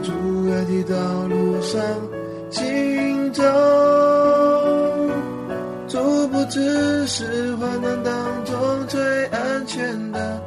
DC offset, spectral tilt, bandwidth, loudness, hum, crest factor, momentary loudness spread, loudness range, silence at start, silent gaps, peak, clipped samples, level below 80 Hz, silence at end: under 0.1%; -5.5 dB/octave; 13 kHz; -20 LUFS; none; 14 dB; 11 LU; 5 LU; 0 s; none; -6 dBFS; under 0.1%; -54 dBFS; 0 s